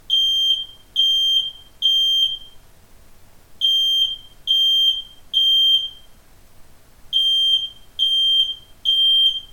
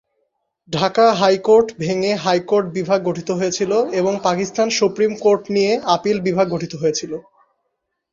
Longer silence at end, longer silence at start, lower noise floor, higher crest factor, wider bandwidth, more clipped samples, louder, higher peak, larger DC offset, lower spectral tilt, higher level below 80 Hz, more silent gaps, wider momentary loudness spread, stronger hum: second, 0.05 s vs 0.95 s; second, 0.1 s vs 0.7 s; second, -46 dBFS vs -74 dBFS; about the same, 12 dB vs 16 dB; first, 17 kHz vs 7.6 kHz; neither; about the same, -16 LUFS vs -18 LUFS; second, -8 dBFS vs -2 dBFS; neither; second, 1 dB/octave vs -4.5 dB/octave; first, -50 dBFS vs -58 dBFS; neither; about the same, 9 LU vs 7 LU; neither